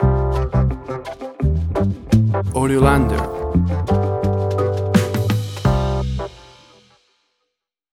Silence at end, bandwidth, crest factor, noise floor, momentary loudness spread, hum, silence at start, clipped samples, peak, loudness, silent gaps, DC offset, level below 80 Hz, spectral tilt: 1.45 s; 15 kHz; 18 dB; -77 dBFS; 9 LU; none; 0 s; under 0.1%; 0 dBFS; -19 LUFS; none; under 0.1%; -26 dBFS; -7.5 dB/octave